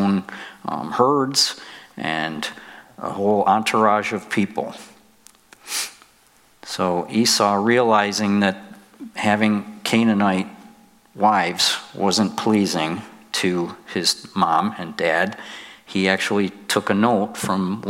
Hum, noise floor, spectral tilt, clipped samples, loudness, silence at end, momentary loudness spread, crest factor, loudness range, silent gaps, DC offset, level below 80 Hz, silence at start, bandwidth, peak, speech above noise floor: none; -55 dBFS; -4 dB/octave; under 0.1%; -20 LUFS; 0 s; 15 LU; 20 dB; 3 LU; none; under 0.1%; -68 dBFS; 0 s; 16.5 kHz; -2 dBFS; 35 dB